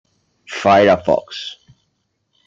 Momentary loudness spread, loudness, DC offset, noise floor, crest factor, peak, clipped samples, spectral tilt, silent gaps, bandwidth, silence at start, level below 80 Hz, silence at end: 18 LU; -14 LUFS; under 0.1%; -69 dBFS; 16 dB; -2 dBFS; under 0.1%; -5.5 dB/octave; none; 7.8 kHz; 0.5 s; -56 dBFS; 0.95 s